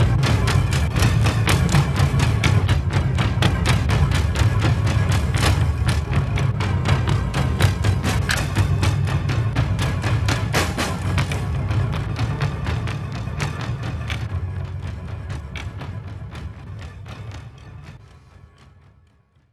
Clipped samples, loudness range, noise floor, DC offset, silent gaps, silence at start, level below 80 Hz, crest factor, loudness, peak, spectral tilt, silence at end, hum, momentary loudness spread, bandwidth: under 0.1%; 15 LU; -57 dBFS; 0.1%; none; 0 s; -28 dBFS; 18 dB; -21 LUFS; -2 dBFS; -5.5 dB/octave; 1.35 s; none; 15 LU; 13.5 kHz